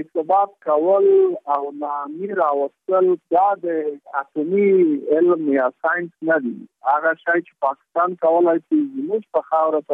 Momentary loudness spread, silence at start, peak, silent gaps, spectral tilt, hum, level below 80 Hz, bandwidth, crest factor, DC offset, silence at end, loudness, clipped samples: 10 LU; 0 s; -6 dBFS; none; -10 dB/octave; none; -82 dBFS; 3.7 kHz; 14 dB; under 0.1%; 0 s; -19 LUFS; under 0.1%